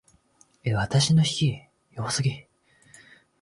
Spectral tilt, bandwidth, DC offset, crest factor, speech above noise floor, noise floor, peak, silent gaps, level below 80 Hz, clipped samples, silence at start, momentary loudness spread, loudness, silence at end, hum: -4.5 dB/octave; 11.5 kHz; under 0.1%; 16 dB; 38 dB; -61 dBFS; -10 dBFS; none; -54 dBFS; under 0.1%; 0.65 s; 20 LU; -25 LUFS; 1 s; none